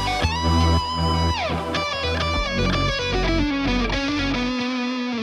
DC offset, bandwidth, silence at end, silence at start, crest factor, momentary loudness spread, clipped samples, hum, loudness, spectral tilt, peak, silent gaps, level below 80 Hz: under 0.1%; 12 kHz; 0 s; 0 s; 14 dB; 4 LU; under 0.1%; none; -22 LUFS; -5 dB/octave; -8 dBFS; none; -30 dBFS